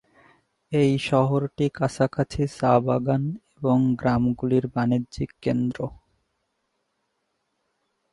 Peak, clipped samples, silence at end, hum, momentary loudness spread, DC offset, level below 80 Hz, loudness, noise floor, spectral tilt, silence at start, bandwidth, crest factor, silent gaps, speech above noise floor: -4 dBFS; under 0.1%; 2.2 s; none; 8 LU; under 0.1%; -50 dBFS; -24 LUFS; -75 dBFS; -7.5 dB/octave; 0.7 s; 11.5 kHz; 20 dB; none; 53 dB